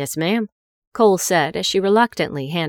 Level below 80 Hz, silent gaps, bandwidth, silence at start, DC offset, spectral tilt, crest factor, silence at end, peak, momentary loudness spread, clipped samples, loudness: -58 dBFS; 0.52-0.92 s; 19 kHz; 0 s; under 0.1%; -4 dB/octave; 16 dB; 0 s; -4 dBFS; 8 LU; under 0.1%; -18 LUFS